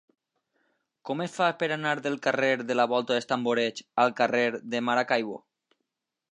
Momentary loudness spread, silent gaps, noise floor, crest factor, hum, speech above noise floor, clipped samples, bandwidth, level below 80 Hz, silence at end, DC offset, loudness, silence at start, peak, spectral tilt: 8 LU; none; -83 dBFS; 20 dB; none; 57 dB; under 0.1%; 11 kHz; -80 dBFS; 0.95 s; under 0.1%; -27 LUFS; 1.05 s; -8 dBFS; -4.5 dB/octave